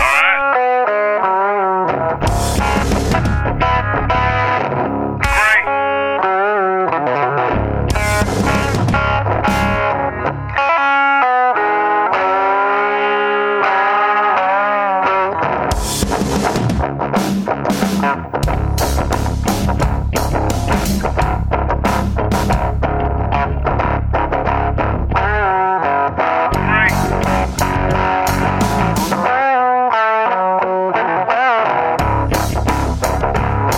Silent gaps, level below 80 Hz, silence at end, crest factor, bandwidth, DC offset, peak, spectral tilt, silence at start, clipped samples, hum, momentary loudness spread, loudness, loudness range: none; -24 dBFS; 0 s; 14 dB; 17 kHz; under 0.1%; 0 dBFS; -5.5 dB/octave; 0 s; under 0.1%; none; 5 LU; -15 LUFS; 3 LU